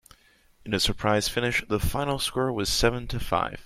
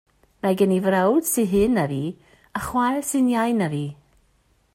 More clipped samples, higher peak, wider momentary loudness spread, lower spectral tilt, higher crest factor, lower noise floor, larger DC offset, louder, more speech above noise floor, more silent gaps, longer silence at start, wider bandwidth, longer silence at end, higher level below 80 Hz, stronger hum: neither; about the same, -6 dBFS vs -6 dBFS; second, 5 LU vs 11 LU; second, -4 dB/octave vs -5.5 dB/octave; about the same, 20 dB vs 16 dB; second, -59 dBFS vs -63 dBFS; neither; second, -26 LUFS vs -22 LUFS; second, 33 dB vs 42 dB; neither; first, 0.65 s vs 0.45 s; about the same, 16.5 kHz vs 16 kHz; second, 0 s vs 0.8 s; first, -38 dBFS vs -50 dBFS; neither